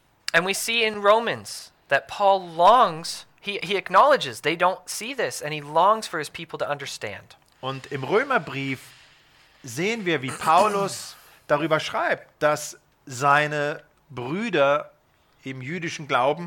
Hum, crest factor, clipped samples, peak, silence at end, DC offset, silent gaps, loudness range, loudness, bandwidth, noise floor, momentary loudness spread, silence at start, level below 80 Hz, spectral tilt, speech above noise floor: none; 18 dB; under 0.1%; -6 dBFS; 0 s; under 0.1%; none; 7 LU; -23 LUFS; 19 kHz; -61 dBFS; 16 LU; 0.35 s; -66 dBFS; -3.5 dB/octave; 38 dB